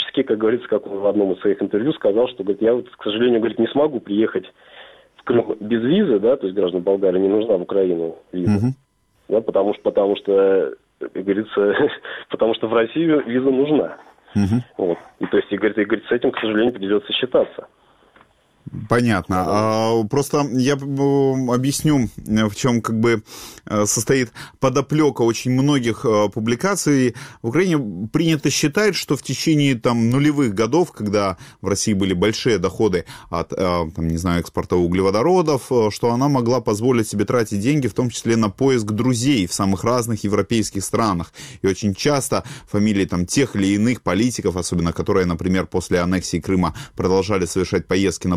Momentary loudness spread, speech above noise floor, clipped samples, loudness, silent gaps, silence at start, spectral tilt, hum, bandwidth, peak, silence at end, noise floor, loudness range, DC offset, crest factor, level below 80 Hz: 6 LU; 35 dB; under 0.1%; -19 LUFS; none; 0 s; -5.5 dB/octave; none; 16 kHz; -2 dBFS; 0 s; -54 dBFS; 2 LU; under 0.1%; 16 dB; -46 dBFS